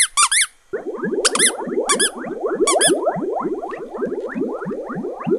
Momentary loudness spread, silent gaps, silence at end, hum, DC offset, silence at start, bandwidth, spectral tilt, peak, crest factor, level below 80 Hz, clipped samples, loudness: 13 LU; none; 0 s; none; under 0.1%; 0 s; 14 kHz; -1.5 dB/octave; 0 dBFS; 20 dB; -56 dBFS; under 0.1%; -19 LUFS